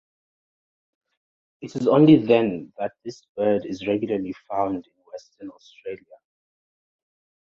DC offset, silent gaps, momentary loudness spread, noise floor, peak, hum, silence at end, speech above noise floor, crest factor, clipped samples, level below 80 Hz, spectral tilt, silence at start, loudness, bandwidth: under 0.1%; 3.29-3.35 s; 26 LU; under -90 dBFS; -4 dBFS; none; 1.6 s; over 68 dB; 20 dB; under 0.1%; -64 dBFS; -8 dB/octave; 1.6 s; -21 LUFS; 7.2 kHz